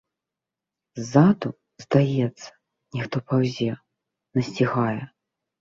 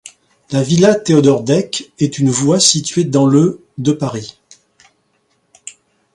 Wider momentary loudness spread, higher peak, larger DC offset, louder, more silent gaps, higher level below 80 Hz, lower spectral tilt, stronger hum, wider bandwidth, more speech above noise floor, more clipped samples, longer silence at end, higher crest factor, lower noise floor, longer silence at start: about the same, 22 LU vs 20 LU; second, -4 dBFS vs 0 dBFS; neither; second, -23 LUFS vs -13 LUFS; neither; second, -62 dBFS vs -54 dBFS; first, -7.5 dB/octave vs -5 dB/octave; neither; second, 7.6 kHz vs 11.5 kHz; first, 65 dB vs 49 dB; neither; about the same, 0.55 s vs 0.45 s; first, 22 dB vs 16 dB; first, -87 dBFS vs -62 dBFS; first, 0.95 s vs 0.05 s